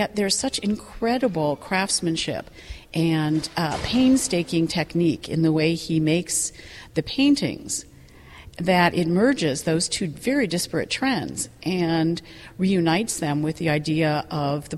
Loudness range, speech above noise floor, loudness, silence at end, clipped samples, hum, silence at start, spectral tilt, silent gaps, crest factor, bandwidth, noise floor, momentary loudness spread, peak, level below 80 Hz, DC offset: 2 LU; 23 dB; -23 LUFS; 0 s; under 0.1%; none; 0 s; -4.5 dB/octave; none; 16 dB; 14 kHz; -46 dBFS; 9 LU; -6 dBFS; -48 dBFS; under 0.1%